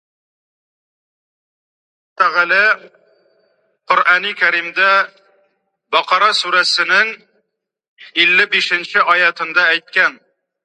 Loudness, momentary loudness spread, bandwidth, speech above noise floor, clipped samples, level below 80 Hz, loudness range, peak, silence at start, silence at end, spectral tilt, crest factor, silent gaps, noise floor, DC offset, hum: -13 LUFS; 6 LU; 11.5 kHz; 57 dB; under 0.1%; -78 dBFS; 5 LU; 0 dBFS; 2.2 s; 0.5 s; -1 dB/octave; 18 dB; 7.88-7.96 s; -72 dBFS; under 0.1%; none